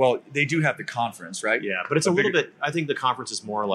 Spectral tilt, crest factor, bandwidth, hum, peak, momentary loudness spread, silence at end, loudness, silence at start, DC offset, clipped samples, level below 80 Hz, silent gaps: -4.5 dB/octave; 16 dB; 13 kHz; none; -8 dBFS; 8 LU; 0 s; -24 LUFS; 0 s; under 0.1%; under 0.1%; -74 dBFS; none